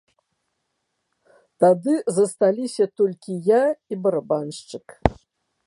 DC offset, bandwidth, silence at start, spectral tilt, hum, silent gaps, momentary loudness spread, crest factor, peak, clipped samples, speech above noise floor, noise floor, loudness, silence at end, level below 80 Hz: under 0.1%; 11.5 kHz; 1.6 s; -6 dB/octave; none; none; 8 LU; 22 dB; 0 dBFS; under 0.1%; 55 dB; -76 dBFS; -21 LUFS; 0.55 s; -44 dBFS